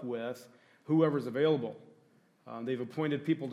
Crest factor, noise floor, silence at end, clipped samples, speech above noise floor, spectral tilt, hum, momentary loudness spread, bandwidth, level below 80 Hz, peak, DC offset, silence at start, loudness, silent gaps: 18 dB; -66 dBFS; 0 s; under 0.1%; 34 dB; -8 dB/octave; none; 16 LU; 13.5 kHz; -86 dBFS; -14 dBFS; under 0.1%; 0 s; -32 LUFS; none